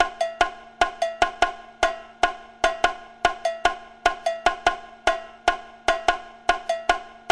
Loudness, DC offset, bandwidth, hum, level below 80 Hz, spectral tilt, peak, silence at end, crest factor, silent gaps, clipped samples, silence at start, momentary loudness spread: -25 LUFS; under 0.1%; 12 kHz; none; -44 dBFS; -2 dB/octave; -4 dBFS; 0 s; 22 dB; none; under 0.1%; 0 s; 3 LU